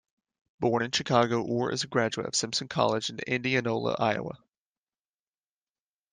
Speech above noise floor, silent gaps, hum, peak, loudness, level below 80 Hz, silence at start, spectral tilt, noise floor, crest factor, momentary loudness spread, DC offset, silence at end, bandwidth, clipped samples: over 62 dB; none; none; -8 dBFS; -28 LUFS; -68 dBFS; 0.6 s; -4 dB/octave; under -90 dBFS; 22 dB; 6 LU; under 0.1%; 1.75 s; 10.5 kHz; under 0.1%